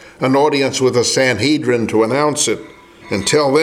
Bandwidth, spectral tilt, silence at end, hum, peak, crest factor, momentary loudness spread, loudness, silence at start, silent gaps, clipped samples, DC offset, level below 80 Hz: 16 kHz; -4 dB/octave; 0 s; none; 0 dBFS; 14 dB; 4 LU; -15 LUFS; 0 s; none; under 0.1%; under 0.1%; -54 dBFS